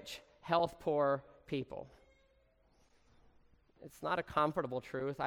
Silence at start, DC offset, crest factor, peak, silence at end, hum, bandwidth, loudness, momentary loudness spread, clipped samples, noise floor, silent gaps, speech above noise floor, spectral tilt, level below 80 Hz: 0 s; under 0.1%; 22 dB; -18 dBFS; 0 s; none; 17 kHz; -36 LUFS; 15 LU; under 0.1%; -71 dBFS; none; 35 dB; -6 dB/octave; -68 dBFS